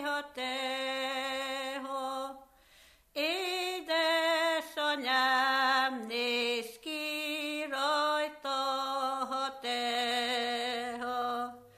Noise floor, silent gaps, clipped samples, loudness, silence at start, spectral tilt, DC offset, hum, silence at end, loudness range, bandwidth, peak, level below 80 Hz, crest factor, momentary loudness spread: -61 dBFS; none; under 0.1%; -32 LUFS; 0 s; -1 dB/octave; under 0.1%; none; 0.1 s; 6 LU; 15 kHz; -16 dBFS; -74 dBFS; 18 dB; 9 LU